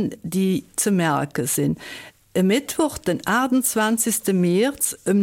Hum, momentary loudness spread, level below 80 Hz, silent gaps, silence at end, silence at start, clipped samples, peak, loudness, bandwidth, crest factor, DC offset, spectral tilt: none; 6 LU; -54 dBFS; none; 0 s; 0 s; under 0.1%; -8 dBFS; -21 LUFS; 17 kHz; 14 dB; under 0.1%; -4.5 dB/octave